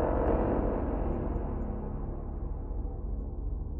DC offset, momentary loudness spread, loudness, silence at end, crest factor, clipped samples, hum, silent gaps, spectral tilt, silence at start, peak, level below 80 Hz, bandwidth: under 0.1%; 10 LU; -34 LUFS; 0 s; 16 dB; under 0.1%; 50 Hz at -45 dBFS; none; -12.5 dB/octave; 0 s; -16 dBFS; -34 dBFS; 3.1 kHz